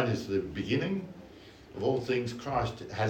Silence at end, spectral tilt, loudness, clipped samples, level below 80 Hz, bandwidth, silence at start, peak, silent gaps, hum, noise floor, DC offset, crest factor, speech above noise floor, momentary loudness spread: 0 s; -6.5 dB/octave; -32 LUFS; under 0.1%; -54 dBFS; 16.5 kHz; 0 s; -14 dBFS; none; none; -51 dBFS; under 0.1%; 18 dB; 20 dB; 18 LU